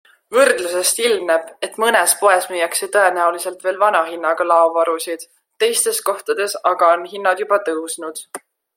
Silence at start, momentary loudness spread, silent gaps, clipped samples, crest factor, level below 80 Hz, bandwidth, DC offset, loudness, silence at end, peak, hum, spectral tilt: 0.3 s; 11 LU; none; under 0.1%; 18 dB; -72 dBFS; 16.5 kHz; under 0.1%; -17 LUFS; 0.4 s; 0 dBFS; none; 0 dB/octave